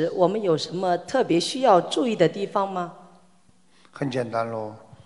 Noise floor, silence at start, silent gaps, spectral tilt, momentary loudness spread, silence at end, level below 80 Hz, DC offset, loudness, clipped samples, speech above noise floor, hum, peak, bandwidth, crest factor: -60 dBFS; 0 s; none; -5.5 dB/octave; 13 LU; 0.1 s; -70 dBFS; 0.1%; -23 LUFS; under 0.1%; 38 dB; none; -4 dBFS; 11.5 kHz; 20 dB